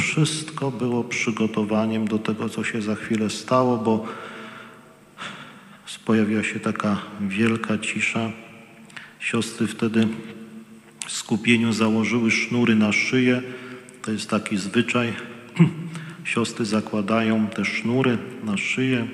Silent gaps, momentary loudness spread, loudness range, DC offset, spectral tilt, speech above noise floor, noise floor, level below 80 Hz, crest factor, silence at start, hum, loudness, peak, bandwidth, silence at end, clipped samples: none; 17 LU; 5 LU; under 0.1%; -5 dB/octave; 25 dB; -48 dBFS; -68 dBFS; 20 dB; 0 s; none; -23 LUFS; -4 dBFS; 12.5 kHz; 0 s; under 0.1%